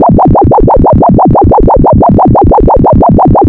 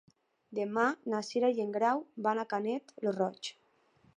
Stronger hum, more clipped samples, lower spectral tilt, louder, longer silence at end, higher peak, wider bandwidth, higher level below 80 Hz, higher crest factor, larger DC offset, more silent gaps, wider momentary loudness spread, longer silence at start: neither; neither; first, -13 dB/octave vs -5 dB/octave; first, -5 LUFS vs -33 LUFS; second, 0 s vs 0.65 s; first, 0 dBFS vs -16 dBFS; second, 3.6 kHz vs 10.5 kHz; first, -14 dBFS vs -84 dBFS; second, 4 dB vs 18 dB; neither; neither; second, 1 LU vs 7 LU; second, 0 s vs 0.5 s